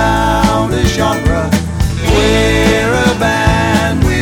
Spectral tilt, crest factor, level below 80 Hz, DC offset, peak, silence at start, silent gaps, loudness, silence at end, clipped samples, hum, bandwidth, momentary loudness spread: -5 dB/octave; 12 dB; -20 dBFS; under 0.1%; 0 dBFS; 0 s; none; -12 LUFS; 0 s; under 0.1%; none; over 20 kHz; 4 LU